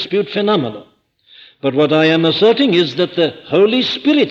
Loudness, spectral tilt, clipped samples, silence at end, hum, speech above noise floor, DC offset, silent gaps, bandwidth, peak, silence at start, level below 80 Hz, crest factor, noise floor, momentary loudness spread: -14 LUFS; -6.5 dB/octave; under 0.1%; 0 s; none; 34 dB; under 0.1%; none; 7.6 kHz; -2 dBFS; 0 s; -62 dBFS; 12 dB; -48 dBFS; 6 LU